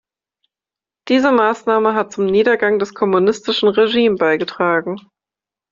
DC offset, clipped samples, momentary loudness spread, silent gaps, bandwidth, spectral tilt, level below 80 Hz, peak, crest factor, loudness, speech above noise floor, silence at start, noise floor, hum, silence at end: under 0.1%; under 0.1%; 4 LU; none; 7.6 kHz; -5 dB/octave; -60 dBFS; -2 dBFS; 14 dB; -15 LUFS; 74 dB; 1.05 s; -89 dBFS; none; 0.7 s